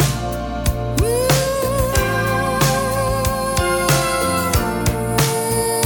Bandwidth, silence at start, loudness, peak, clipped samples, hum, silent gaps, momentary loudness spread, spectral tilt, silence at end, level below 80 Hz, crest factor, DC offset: 19.5 kHz; 0 s; -18 LUFS; 0 dBFS; under 0.1%; none; none; 4 LU; -4.5 dB/octave; 0 s; -28 dBFS; 16 dB; under 0.1%